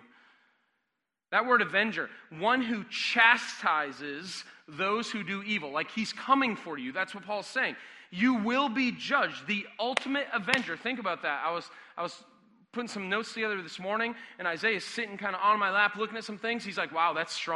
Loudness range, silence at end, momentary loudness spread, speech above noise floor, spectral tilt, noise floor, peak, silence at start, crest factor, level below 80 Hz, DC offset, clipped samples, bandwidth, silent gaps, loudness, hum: 6 LU; 0 s; 12 LU; 54 dB; -3.5 dB/octave; -84 dBFS; -4 dBFS; 1.3 s; 28 dB; -78 dBFS; under 0.1%; under 0.1%; 11.5 kHz; none; -29 LUFS; none